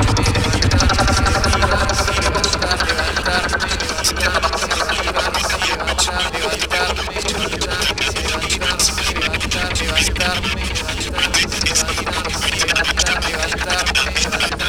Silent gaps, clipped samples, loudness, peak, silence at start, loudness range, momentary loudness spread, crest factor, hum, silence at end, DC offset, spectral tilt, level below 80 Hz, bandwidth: none; under 0.1%; -17 LUFS; 0 dBFS; 0 s; 2 LU; 5 LU; 18 dB; none; 0 s; 0.6%; -2.5 dB/octave; -26 dBFS; 17.5 kHz